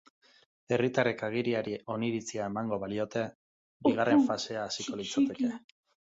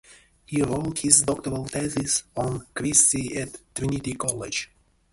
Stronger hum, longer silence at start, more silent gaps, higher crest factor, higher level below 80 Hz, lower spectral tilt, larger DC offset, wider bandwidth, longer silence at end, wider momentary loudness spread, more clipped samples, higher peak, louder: neither; first, 0.7 s vs 0.1 s; first, 3.35-3.80 s vs none; second, 20 dB vs 26 dB; second, -68 dBFS vs -50 dBFS; first, -5 dB/octave vs -3 dB/octave; neither; second, 7.8 kHz vs 12 kHz; about the same, 0.55 s vs 0.5 s; second, 9 LU vs 13 LU; neither; second, -12 dBFS vs 0 dBFS; second, -31 LUFS vs -23 LUFS